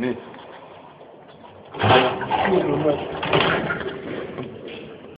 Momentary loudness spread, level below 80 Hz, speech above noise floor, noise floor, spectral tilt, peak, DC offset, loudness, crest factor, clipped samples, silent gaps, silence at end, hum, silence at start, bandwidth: 23 LU; -52 dBFS; 25 dB; -44 dBFS; -10 dB/octave; -2 dBFS; under 0.1%; -21 LUFS; 22 dB; under 0.1%; none; 0 s; none; 0 s; 5.2 kHz